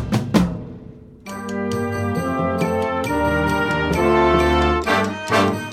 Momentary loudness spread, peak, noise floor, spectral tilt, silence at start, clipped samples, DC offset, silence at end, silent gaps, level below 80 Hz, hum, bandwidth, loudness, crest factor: 15 LU; -2 dBFS; -40 dBFS; -6 dB/octave; 0 s; under 0.1%; under 0.1%; 0 s; none; -34 dBFS; none; 15.5 kHz; -19 LUFS; 18 dB